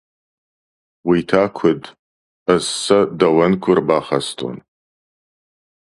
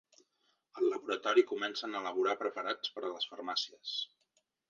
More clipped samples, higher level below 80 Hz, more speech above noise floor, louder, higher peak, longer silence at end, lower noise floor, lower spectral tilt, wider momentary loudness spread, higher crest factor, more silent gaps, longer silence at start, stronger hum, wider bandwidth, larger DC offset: neither; first, -54 dBFS vs -90 dBFS; first, over 74 dB vs 43 dB; first, -17 LUFS vs -35 LUFS; first, 0 dBFS vs -14 dBFS; first, 1.4 s vs 0.65 s; first, under -90 dBFS vs -78 dBFS; first, -5 dB/octave vs -2.5 dB/octave; first, 12 LU vs 9 LU; about the same, 18 dB vs 22 dB; first, 1.99-2.46 s vs none; first, 1.05 s vs 0.75 s; neither; first, 11.5 kHz vs 7.4 kHz; neither